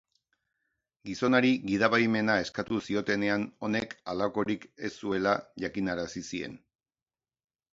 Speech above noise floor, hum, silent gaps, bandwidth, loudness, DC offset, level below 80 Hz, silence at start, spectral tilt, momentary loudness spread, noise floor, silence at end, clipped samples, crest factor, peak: over 61 dB; none; none; 7.8 kHz; -29 LUFS; under 0.1%; -62 dBFS; 1.05 s; -5.5 dB/octave; 12 LU; under -90 dBFS; 1.15 s; under 0.1%; 22 dB; -10 dBFS